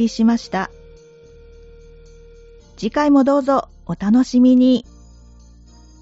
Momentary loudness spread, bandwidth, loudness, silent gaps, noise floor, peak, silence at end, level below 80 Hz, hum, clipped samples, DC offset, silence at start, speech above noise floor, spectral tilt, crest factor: 12 LU; 8 kHz; -16 LUFS; none; -45 dBFS; -4 dBFS; 1.2 s; -46 dBFS; none; under 0.1%; under 0.1%; 0 s; 29 dB; -5.5 dB/octave; 14 dB